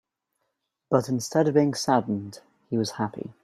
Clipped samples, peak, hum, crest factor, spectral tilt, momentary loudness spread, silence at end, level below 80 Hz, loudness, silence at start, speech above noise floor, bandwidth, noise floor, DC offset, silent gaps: under 0.1%; -6 dBFS; none; 20 dB; -5.5 dB/octave; 10 LU; 0.15 s; -68 dBFS; -25 LUFS; 0.9 s; 54 dB; 14.5 kHz; -79 dBFS; under 0.1%; none